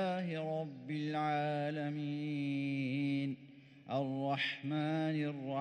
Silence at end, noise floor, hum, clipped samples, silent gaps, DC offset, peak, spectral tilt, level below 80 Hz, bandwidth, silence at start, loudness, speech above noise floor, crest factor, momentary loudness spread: 0 s; -57 dBFS; none; under 0.1%; none; under 0.1%; -24 dBFS; -7.5 dB/octave; -86 dBFS; 9.2 kHz; 0 s; -37 LUFS; 21 dB; 12 dB; 6 LU